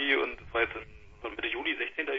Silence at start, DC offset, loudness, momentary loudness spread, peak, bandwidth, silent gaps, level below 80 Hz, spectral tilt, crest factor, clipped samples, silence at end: 0 s; under 0.1%; -31 LUFS; 14 LU; -12 dBFS; 7.4 kHz; none; -56 dBFS; -5.5 dB/octave; 22 dB; under 0.1%; 0 s